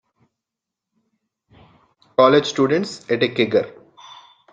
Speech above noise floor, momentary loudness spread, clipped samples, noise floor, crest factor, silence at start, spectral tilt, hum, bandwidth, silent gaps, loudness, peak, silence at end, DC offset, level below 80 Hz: 68 dB; 10 LU; under 0.1%; -85 dBFS; 20 dB; 2.2 s; -5 dB/octave; none; 9.2 kHz; none; -18 LUFS; -2 dBFS; 0.8 s; under 0.1%; -64 dBFS